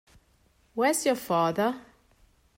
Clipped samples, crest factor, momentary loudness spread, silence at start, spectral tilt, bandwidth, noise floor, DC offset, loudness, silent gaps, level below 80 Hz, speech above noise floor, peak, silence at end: under 0.1%; 16 dB; 12 LU; 0.75 s; -4 dB/octave; 16 kHz; -65 dBFS; under 0.1%; -26 LUFS; none; -66 dBFS; 39 dB; -12 dBFS; 0.8 s